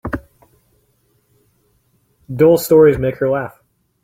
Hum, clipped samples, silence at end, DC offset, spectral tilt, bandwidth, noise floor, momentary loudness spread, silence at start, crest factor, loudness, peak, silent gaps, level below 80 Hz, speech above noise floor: none; under 0.1%; 0.55 s; under 0.1%; -6.5 dB/octave; 16.5 kHz; -61 dBFS; 19 LU; 0.05 s; 16 dB; -14 LUFS; -2 dBFS; none; -42 dBFS; 48 dB